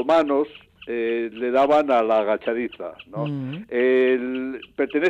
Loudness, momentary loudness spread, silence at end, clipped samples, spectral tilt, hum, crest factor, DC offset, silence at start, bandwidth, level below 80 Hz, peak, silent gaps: -22 LUFS; 13 LU; 0 s; under 0.1%; -7 dB/octave; none; 12 dB; under 0.1%; 0 s; 7.8 kHz; -62 dBFS; -10 dBFS; none